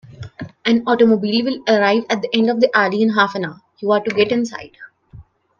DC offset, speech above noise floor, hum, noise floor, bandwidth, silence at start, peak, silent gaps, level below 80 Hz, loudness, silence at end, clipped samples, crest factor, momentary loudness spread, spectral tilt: under 0.1%; 27 dB; none; -43 dBFS; 7.2 kHz; 0.1 s; 0 dBFS; none; -58 dBFS; -17 LUFS; 0.4 s; under 0.1%; 18 dB; 13 LU; -5.5 dB/octave